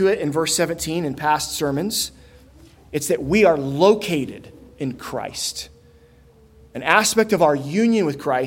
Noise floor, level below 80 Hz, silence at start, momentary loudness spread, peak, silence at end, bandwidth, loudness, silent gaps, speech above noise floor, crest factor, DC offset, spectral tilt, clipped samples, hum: -51 dBFS; -50 dBFS; 0 s; 14 LU; 0 dBFS; 0 s; 17 kHz; -20 LUFS; none; 31 dB; 20 dB; under 0.1%; -4 dB/octave; under 0.1%; none